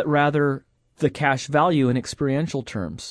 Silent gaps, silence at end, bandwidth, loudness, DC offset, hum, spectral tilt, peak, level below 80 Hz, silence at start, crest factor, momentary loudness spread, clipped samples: none; 0 s; 11 kHz; -22 LUFS; under 0.1%; none; -6 dB/octave; -4 dBFS; -54 dBFS; 0 s; 18 dB; 10 LU; under 0.1%